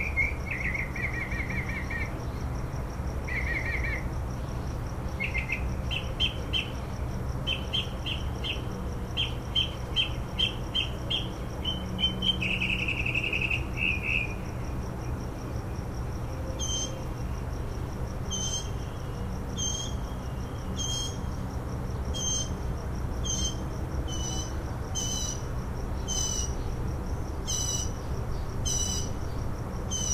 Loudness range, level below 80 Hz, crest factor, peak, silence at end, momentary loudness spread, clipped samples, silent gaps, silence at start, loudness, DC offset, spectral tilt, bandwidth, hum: 5 LU; -36 dBFS; 18 dB; -14 dBFS; 0 s; 8 LU; under 0.1%; none; 0 s; -31 LUFS; under 0.1%; -3 dB/octave; 15.5 kHz; none